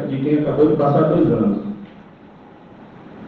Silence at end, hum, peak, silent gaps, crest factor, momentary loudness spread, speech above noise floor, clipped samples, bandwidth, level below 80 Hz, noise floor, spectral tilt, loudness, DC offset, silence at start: 0 s; none; -4 dBFS; none; 16 dB; 12 LU; 27 dB; under 0.1%; 4.5 kHz; -48 dBFS; -43 dBFS; -11 dB/octave; -17 LUFS; under 0.1%; 0 s